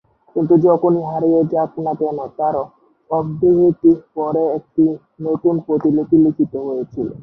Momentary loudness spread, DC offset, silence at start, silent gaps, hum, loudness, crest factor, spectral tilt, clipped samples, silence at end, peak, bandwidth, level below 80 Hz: 10 LU; under 0.1%; 0.35 s; none; none; -17 LUFS; 14 dB; -12.5 dB/octave; under 0.1%; 0 s; -2 dBFS; 1.8 kHz; -54 dBFS